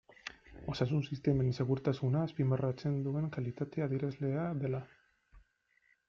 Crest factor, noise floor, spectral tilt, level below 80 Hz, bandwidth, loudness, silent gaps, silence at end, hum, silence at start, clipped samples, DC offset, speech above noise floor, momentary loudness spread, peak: 16 dB; -73 dBFS; -8.5 dB/octave; -62 dBFS; 7 kHz; -35 LUFS; none; 0.7 s; none; 0.25 s; under 0.1%; under 0.1%; 40 dB; 10 LU; -18 dBFS